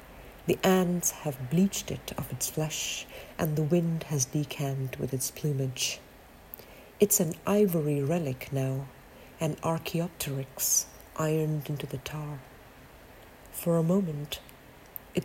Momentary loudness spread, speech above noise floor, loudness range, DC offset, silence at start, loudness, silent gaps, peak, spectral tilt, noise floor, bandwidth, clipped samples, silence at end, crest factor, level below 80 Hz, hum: 15 LU; 22 dB; 4 LU; under 0.1%; 0 s; -29 LUFS; none; -10 dBFS; -4.5 dB/octave; -51 dBFS; 16.5 kHz; under 0.1%; 0 s; 20 dB; -56 dBFS; none